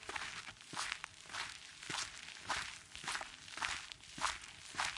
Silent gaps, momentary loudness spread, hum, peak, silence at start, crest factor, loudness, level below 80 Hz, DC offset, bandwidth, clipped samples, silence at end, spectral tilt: none; 7 LU; none; -16 dBFS; 0 s; 28 dB; -43 LUFS; -68 dBFS; under 0.1%; 11.5 kHz; under 0.1%; 0 s; 0 dB/octave